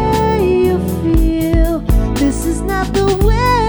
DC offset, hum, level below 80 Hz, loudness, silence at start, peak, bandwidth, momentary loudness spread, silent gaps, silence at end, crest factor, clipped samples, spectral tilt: under 0.1%; none; -18 dBFS; -15 LUFS; 0 s; -2 dBFS; over 20 kHz; 4 LU; none; 0 s; 12 dB; under 0.1%; -6.5 dB/octave